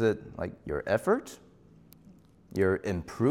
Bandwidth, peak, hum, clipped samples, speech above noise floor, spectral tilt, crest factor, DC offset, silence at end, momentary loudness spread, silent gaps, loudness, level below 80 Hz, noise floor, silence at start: 16 kHz; -14 dBFS; none; under 0.1%; 28 dB; -7 dB/octave; 18 dB; under 0.1%; 0 s; 11 LU; none; -31 LUFS; -56 dBFS; -57 dBFS; 0 s